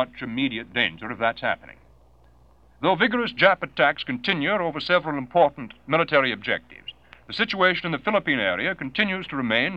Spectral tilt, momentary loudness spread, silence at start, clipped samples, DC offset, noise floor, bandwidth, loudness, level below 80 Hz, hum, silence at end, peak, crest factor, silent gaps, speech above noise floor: -6.5 dB/octave; 8 LU; 0 s; under 0.1%; 0.1%; -56 dBFS; 7.8 kHz; -23 LUFS; -58 dBFS; none; 0 s; -2 dBFS; 22 dB; none; 32 dB